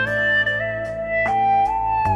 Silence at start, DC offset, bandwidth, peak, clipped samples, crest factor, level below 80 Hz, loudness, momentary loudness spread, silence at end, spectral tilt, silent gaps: 0 s; under 0.1%; 10.5 kHz; -10 dBFS; under 0.1%; 10 dB; -42 dBFS; -19 LUFS; 7 LU; 0 s; -5.5 dB/octave; none